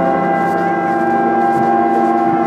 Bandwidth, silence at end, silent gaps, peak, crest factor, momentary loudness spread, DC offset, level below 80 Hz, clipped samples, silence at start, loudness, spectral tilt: 10.5 kHz; 0 s; none; -2 dBFS; 12 dB; 2 LU; under 0.1%; -54 dBFS; under 0.1%; 0 s; -14 LUFS; -7.5 dB/octave